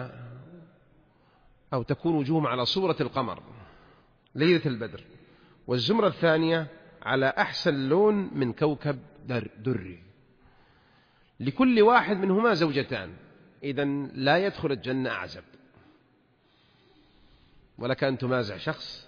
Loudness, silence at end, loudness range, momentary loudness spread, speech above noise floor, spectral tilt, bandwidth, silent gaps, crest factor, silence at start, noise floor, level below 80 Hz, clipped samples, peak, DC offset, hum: -26 LUFS; 0.05 s; 8 LU; 16 LU; 39 dB; -7 dB/octave; 5.2 kHz; none; 20 dB; 0 s; -65 dBFS; -62 dBFS; under 0.1%; -8 dBFS; under 0.1%; none